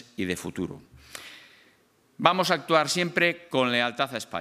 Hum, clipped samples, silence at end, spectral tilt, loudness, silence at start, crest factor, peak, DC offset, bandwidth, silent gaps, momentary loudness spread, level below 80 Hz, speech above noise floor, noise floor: none; under 0.1%; 0 s; -3.5 dB/octave; -25 LUFS; 0.2 s; 26 dB; -2 dBFS; under 0.1%; 15.5 kHz; none; 20 LU; -66 dBFS; 37 dB; -63 dBFS